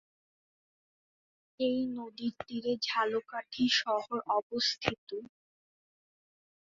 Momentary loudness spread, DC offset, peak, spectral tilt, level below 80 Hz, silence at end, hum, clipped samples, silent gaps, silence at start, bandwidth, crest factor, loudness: 11 LU; under 0.1%; -6 dBFS; -1.5 dB/octave; -70 dBFS; 1.5 s; none; under 0.1%; 4.43-4.50 s, 4.98-5.07 s; 1.6 s; 7.4 kHz; 28 dB; -32 LUFS